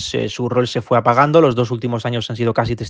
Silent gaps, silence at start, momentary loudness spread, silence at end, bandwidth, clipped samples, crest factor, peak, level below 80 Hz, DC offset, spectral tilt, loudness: none; 0 s; 9 LU; 0 s; 9.4 kHz; under 0.1%; 16 dB; 0 dBFS; -46 dBFS; under 0.1%; -6 dB/octave; -17 LUFS